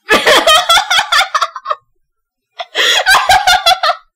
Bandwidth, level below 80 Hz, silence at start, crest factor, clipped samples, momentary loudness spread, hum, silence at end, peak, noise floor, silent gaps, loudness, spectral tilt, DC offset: 17.5 kHz; -42 dBFS; 0.1 s; 12 dB; under 0.1%; 15 LU; none; 0.2 s; 0 dBFS; -70 dBFS; none; -9 LUFS; 0 dB/octave; under 0.1%